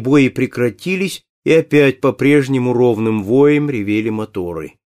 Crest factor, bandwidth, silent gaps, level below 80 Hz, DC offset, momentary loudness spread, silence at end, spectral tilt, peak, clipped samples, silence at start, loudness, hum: 14 dB; 15 kHz; 1.29-1.43 s; -54 dBFS; under 0.1%; 11 LU; 0.3 s; -7 dB/octave; -2 dBFS; under 0.1%; 0 s; -15 LUFS; none